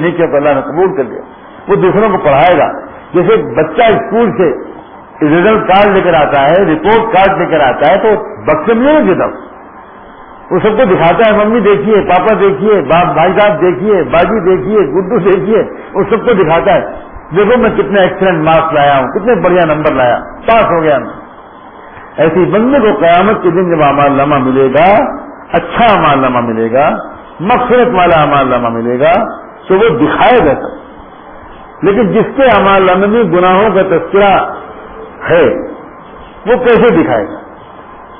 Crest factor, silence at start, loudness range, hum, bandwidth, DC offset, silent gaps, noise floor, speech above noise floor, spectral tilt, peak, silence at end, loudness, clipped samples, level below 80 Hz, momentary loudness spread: 10 dB; 0 s; 3 LU; none; 3.8 kHz; under 0.1%; none; -32 dBFS; 24 dB; -10 dB/octave; 0 dBFS; 0 s; -9 LUFS; under 0.1%; -36 dBFS; 10 LU